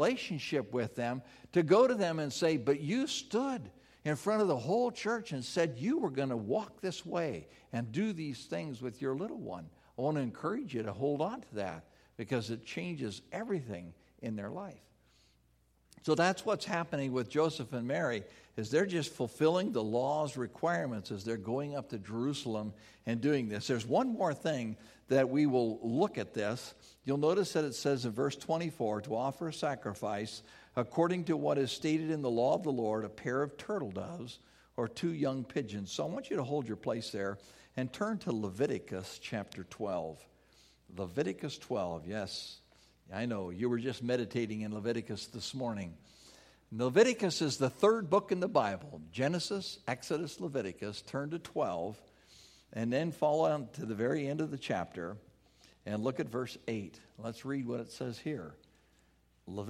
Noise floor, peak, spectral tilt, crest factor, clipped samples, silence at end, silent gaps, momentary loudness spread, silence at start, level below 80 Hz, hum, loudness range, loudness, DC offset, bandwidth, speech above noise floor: -70 dBFS; -12 dBFS; -5.5 dB/octave; 22 dB; under 0.1%; 0 s; none; 13 LU; 0 s; -70 dBFS; none; 8 LU; -35 LUFS; under 0.1%; 15 kHz; 36 dB